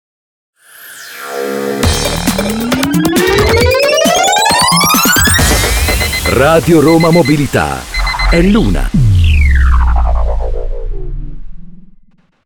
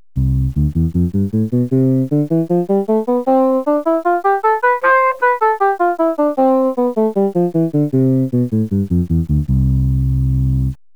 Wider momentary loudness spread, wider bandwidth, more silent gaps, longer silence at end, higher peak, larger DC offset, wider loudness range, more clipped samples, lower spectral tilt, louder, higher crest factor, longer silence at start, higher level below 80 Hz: first, 15 LU vs 3 LU; first, over 20 kHz vs 5 kHz; neither; first, 0.6 s vs 0.2 s; first, 0 dBFS vs -4 dBFS; second, under 0.1% vs 0.8%; first, 6 LU vs 2 LU; neither; second, -4 dB/octave vs -10 dB/octave; first, -10 LUFS vs -15 LUFS; about the same, 10 dB vs 12 dB; first, 0.8 s vs 0.15 s; first, -16 dBFS vs -26 dBFS